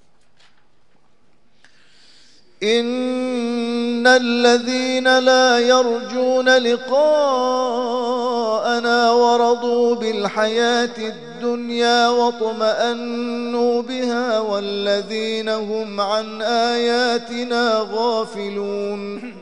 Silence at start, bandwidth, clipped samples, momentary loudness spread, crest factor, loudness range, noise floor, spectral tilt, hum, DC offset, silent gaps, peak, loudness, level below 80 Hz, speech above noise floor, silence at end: 2.6 s; 10 kHz; under 0.1%; 10 LU; 18 dB; 5 LU; -60 dBFS; -3 dB/octave; none; 0.4%; none; -2 dBFS; -18 LUFS; -70 dBFS; 42 dB; 0 s